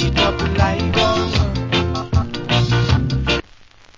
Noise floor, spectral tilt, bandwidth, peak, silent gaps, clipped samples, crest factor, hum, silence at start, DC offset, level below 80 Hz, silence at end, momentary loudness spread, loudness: -45 dBFS; -5.5 dB/octave; 7.6 kHz; -2 dBFS; none; under 0.1%; 16 dB; none; 0 s; under 0.1%; -26 dBFS; 0.55 s; 4 LU; -18 LUFS